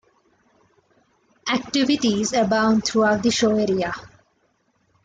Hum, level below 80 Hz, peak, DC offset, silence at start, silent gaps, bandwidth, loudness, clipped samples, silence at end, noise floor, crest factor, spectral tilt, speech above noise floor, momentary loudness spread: none; -56 dBFS; -8 dBFS; under 0.1%; 1.45 s; none; 9.4 kHz; -20 LUFS; under 0.1%; 0.95 s; -66 dBFS; 14 dB; -4 dB/octave; 46 dB; 7 LU